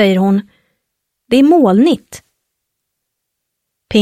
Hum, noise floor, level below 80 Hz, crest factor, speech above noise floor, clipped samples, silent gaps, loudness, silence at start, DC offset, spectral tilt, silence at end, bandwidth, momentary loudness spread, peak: none; -75 dBFS; -52 dBFS; 14 dB; 64 dB; under 0.1%; none; -12 LUFS; 0 s; under 0.1%; -6.5 dB/octave; 0 s; 14.5 kHz; 9 LU; 0 dBFS